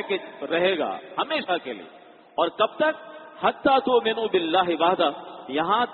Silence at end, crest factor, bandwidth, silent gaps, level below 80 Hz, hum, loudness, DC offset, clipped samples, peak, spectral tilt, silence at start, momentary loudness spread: 0 s; 18 dB; 4.5 kHz; none; -66 dBFS; none; -24 LUFS; under 0.1%; under 0.1%; -6 dBFS; -1.5 dB/octave; 0 s; 12 LU